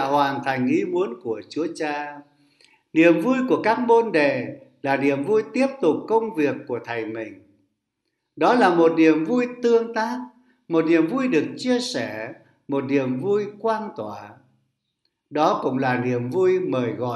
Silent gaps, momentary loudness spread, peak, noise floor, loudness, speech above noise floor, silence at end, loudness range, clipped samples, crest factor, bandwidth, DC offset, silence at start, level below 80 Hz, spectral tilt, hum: none; 14 LU; -2 dBFS; -77 dBFS; -22 LUFS; 56 dB; 0 s; 5 LU; under 0.1%; 20 dB; 12 kHz; under 0.1%; 0 s; -72 dBFS; -6 dB/octave; none